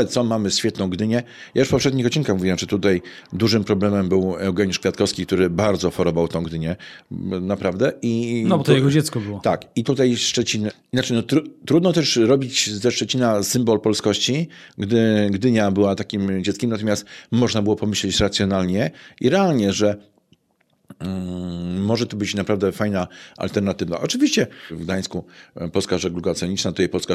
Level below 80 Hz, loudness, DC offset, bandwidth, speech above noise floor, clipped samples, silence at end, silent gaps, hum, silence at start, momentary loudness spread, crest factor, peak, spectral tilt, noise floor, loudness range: -50 dBFS; -20 LUFS; under 0.1%; 15 kHz; 45 dB; under 0.1%; 0 s; none; none; 0 s; 9 LU; 18 dB; -2 dBFS; -5 dB/octave; -65 dBFS; 4 LU